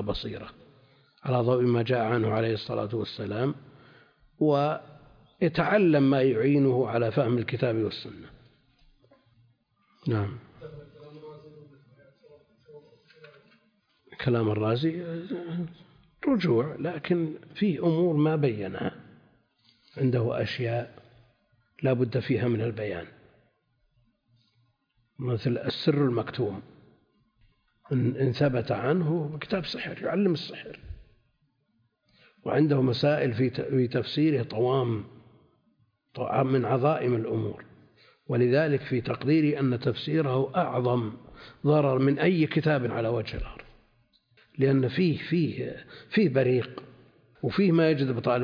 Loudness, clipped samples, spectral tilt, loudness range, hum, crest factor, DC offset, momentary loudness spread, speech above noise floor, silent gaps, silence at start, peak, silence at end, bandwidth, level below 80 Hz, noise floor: -27 LUFS; under 0.1%; -9 dB/octave; 7 LU; none; 18 dB; under 0.1%; 15 LU; 46 dB; none; 0 s; -10 dBFS; 0 s; 5.2 kHz; -56 dBFS; -72 dBFS